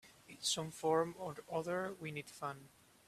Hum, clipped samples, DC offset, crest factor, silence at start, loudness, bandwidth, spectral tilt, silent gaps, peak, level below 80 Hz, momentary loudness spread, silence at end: none; under 0.1%; under 0.1%; 20 dB; 0.05 s; -40 LUFS; 15 kHz; -3.5 dB/octave; none; -20 dBFS; -76 dBFS; 11 LU; 0.4 s